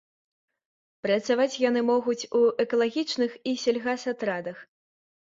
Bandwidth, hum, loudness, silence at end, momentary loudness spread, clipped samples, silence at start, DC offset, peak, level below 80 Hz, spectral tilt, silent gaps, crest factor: 7.8 kHz; none; -26 LUFS; 0.6 s; 8 LU; under 0.1%; 1.05 s; under 0.1%; -10 dBFS; -74 dBFS; -4 dB/octave; none; 16 dB